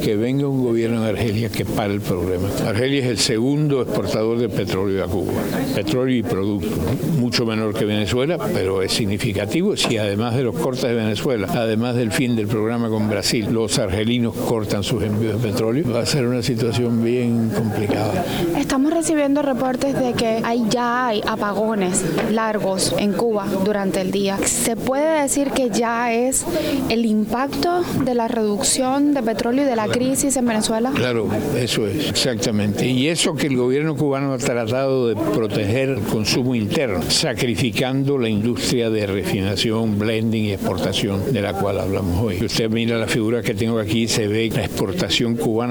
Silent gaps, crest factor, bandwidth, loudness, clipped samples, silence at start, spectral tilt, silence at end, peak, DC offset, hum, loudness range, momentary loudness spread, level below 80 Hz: none; 14 dB; over 20 kHz; -20 LUFS; under 0.1%; 0 s; -5 dB/octave; 0 s; -4 dBFS; under 0.1%; none; 1 LU; 3 LU; -44 dBFS